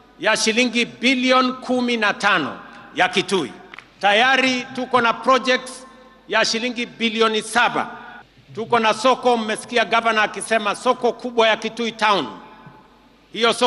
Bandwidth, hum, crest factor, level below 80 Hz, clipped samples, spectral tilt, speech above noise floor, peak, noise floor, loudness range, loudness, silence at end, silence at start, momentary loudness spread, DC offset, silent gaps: 12 kHz; none; 16 dB; -62 dBFS; under 0.1%; -2.5 dB/octave; 32 dB; -4 dBFS; -51 dBFS; 2 LU; -19 LUFS; 0 s; 0.2 s; 13 LU; under 0.1%; none